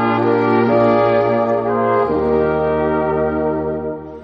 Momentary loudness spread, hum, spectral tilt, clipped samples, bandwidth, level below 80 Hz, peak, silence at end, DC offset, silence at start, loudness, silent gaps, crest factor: 6 LU; none; -9.5 dB/octave; under 0.1%; 6 kHz; -40 dBFS; -2 dBFS; 0 s; under 0.1%; 0 s; -16 LUFS; none; 14 dB